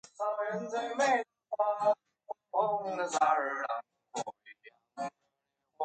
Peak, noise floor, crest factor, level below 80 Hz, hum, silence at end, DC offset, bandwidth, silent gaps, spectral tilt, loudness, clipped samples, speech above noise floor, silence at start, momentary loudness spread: -14 dBFS; -83 dBFS; 20 dB; -86 dBFS; none; 0 s; under 0.1%; 9.4 kHz; none; -3 dB/octave; -33 LUFS; under 0.1%; 52 dB; 0.2 s; 14 LU